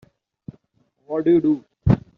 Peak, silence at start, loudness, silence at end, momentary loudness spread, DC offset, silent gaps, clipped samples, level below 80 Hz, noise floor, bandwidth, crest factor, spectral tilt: -4 dBFS; 1.1 s; -20 LUFS; 0.2 s; 6 LU; under 0.1%; none; under 0.1%; -40 dBFS; -66 dBFS; 5 kHz; 20 dB; -10 dB/octave